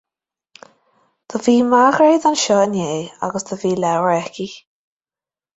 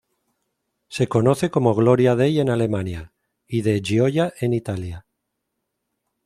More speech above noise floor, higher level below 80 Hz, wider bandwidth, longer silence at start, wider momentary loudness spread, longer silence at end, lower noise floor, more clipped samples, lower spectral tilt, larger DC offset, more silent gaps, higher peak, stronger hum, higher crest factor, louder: first, over 74 dB vs 58 dB; second, -62 dBFS vs -52 dBFS; second, 8.2 kHz vs 13 kHz; first, 1.3 s vs 0.9 s; about the same, 14 LU vs 14 LU; second, 1 s vs 1.25 s; first, under -90 dBFS vs -78 dBFS; neither; second, -4.5 dB/octave vs -7 dB/octave; neither; neither; about the same, -2 dBFS vs -2 dBFS; neither; about the same, 16 dB vs 20 dB; first, -16 LUFS vs -20 LUFS